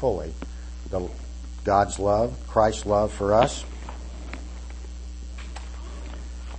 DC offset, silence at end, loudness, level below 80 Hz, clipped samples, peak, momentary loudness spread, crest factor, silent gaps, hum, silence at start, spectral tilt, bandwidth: under 0.1%; 0 s; -24 LUFS; -36 dBFS; under 0.1%; -6 dBFS; 17 LU; 20 dB; none; none; 0 s; -5.5 dB/octave; 8.8 kHz